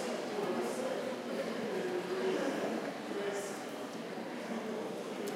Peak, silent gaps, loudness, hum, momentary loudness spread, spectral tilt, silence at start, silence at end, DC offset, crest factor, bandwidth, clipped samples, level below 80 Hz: -22 dBFS; none; -38 LUFS; none; 7 LU; -4.5 dB/octave; 0 s; 0 s; under 0.1%; 16 dB; 16 kHz; under 0.1%; -88 dBFS